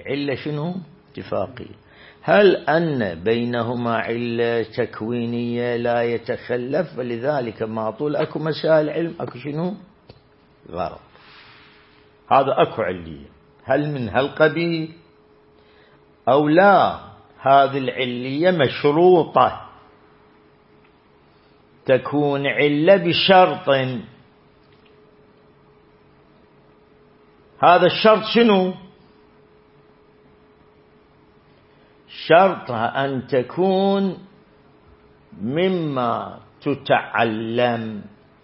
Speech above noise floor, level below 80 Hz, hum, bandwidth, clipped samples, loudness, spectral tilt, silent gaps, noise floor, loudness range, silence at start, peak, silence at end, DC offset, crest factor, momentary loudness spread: 35 dB; -60 dBFS; none; 5.8 kHz; under 0.1%; -19 LUFS; -10.5 dB/octave; none; -54 dBFS; 6 LU; 0 s; -2 dBFS; 0.35 s; under 0.1%; 20 dB; 16 LU